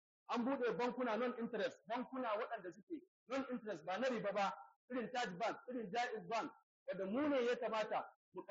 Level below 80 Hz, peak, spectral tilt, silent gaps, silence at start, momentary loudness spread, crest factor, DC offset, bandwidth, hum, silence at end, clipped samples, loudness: -88 dBFS; -28 dBFS; -3 dB/octave; 2.83-2.87 s, 3.08-3.26 s, 4.76-4.88 s, 6.63-6.86 s, 8.16-8.32 s; 0.3 s; 12 LU; 14 dB; under 0.1%; 7.4 kHz; none; 0.05 s; under 0.1%; -42 LUFS